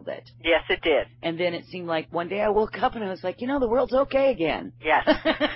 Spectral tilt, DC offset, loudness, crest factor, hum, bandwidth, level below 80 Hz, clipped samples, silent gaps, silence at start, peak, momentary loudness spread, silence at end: -9.5 dB/octave; under 0.1%; -24 LUFS; 16 dB; none; 5.8 kHz; -48 dBFS; under 0.1%; none; 0 s; -8 dBFS; 9 LU; 0 s